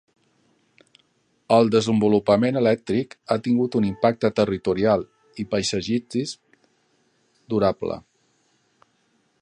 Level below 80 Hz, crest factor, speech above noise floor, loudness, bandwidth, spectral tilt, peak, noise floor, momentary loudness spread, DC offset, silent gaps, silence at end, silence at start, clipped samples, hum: -56 dBFS; 20 dB; 46 dB; -22 LUFS; 10.5 kHz; -6 dB/octave; -4 dBFS; -66 dBFS; 11 LU; under 0.1%; none; 1.4 s; 1.5 s; under 0.1%; none